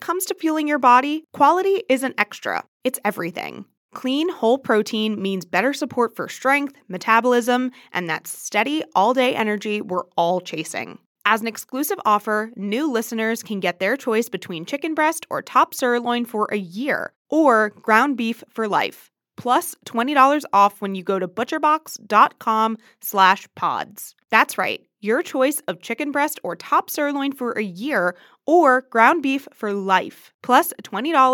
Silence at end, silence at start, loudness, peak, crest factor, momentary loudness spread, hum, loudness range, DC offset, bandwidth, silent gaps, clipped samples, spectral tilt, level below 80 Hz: 0 s; 0 s; -20 LUFS; 0 dBFS; 20 dB; 11 LU; none; 4 LU; under 0.1%; 19 kHz; 2.68-2.80 s, 3.77-3.89 s, 11.06-11.15 s, 17.16-17.25 s, 30.34-30.39 s; under 0.1%; -4 dB/octave; -86 dBFS